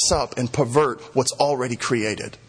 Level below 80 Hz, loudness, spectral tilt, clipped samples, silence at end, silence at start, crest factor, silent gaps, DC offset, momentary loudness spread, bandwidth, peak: -44 dBFS; -22 LUFS; -4 dB/octave; under 0.1%; 0.15 s; 0 s; 18 dB; none; under 0.1%; 4 LU; 10.5 kHz; -4 dBFS